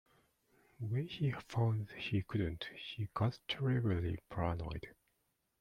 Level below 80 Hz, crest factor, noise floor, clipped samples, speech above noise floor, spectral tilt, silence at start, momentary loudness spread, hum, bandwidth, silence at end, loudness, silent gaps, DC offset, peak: -58 dBFS; 18 dB; -82 dBFS; under 0.1%; 44 dB; -7.5 dB/octave; 0.8 s; 10 LU; none; 10 kHz; 0.7 s; -39 LUFS; none; under 0.1%; -20 dBFS